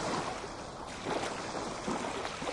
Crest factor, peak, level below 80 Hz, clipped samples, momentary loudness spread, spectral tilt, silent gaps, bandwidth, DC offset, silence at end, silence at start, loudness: 16 dB; -20 dBFS; -58 dBFS; under 0.1%; 7 LU; -3.5 dB/octave; none; 11.5 kHz; under 0.1%; 0 s; 0 s; -37 LUFS